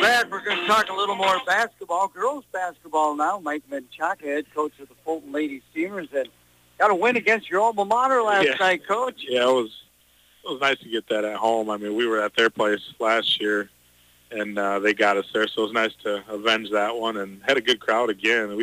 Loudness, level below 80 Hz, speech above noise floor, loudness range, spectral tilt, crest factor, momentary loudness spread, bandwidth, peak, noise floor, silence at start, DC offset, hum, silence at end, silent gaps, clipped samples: -23 LUFS; -68 dBFS; 35 dB; 6 LU; -3 dB/octave; 16 dB; 10 LU; 15.5 kHz; -8 dBFS; -59 dBFS; 0 s; under 0.1%; none; 0 s; none; under 0.1%